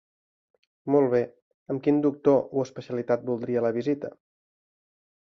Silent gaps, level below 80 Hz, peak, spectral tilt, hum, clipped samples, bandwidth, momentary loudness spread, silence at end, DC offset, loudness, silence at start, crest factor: 1.42-1.66 s; -70 dBFS; -8 dBFS; -8.5 dB/octave; none; under 0.1%; 6.8 kHz; 12 LU; 1.15 s; under 0.1%; -26 LUFS; 0.85 s; 18 dB